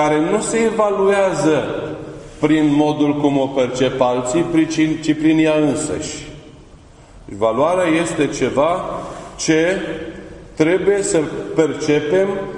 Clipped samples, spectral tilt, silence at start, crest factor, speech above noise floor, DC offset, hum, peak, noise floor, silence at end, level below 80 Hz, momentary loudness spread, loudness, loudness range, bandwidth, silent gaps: under 0.1%; -5 dB/octave; 0 s; 16 dB; 26 dB; under 0.1%; none; -2 dBFS; -43 dBFS; 0 s; -46 dBFS; 13 LU; -17 LUFS; 3 LU; 11 kHz; none